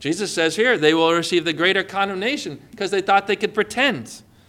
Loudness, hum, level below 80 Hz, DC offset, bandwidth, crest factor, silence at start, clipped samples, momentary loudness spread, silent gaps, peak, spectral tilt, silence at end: -19 LUFS; none; -62 dBFS; under 0.1%; 16 kHz; 18 dB; 0 s; under 0.1%; 11 LU; none; -2 dBFS; -3.5 dB/octave; 0.3 s